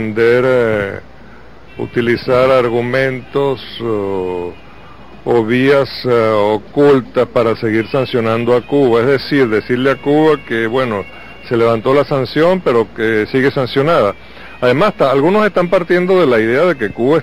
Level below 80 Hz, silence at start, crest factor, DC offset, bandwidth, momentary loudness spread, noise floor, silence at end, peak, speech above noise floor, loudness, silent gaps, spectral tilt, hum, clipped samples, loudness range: -44 dBFS; 0 s; 10 dB; 1%; 15 kHz; 8 LU; -39 dBFS; 0 s; -4 dBFS; 26 dB; -13 LUFS; none; -7 dB/octave; none; under 0.1%; 3 LU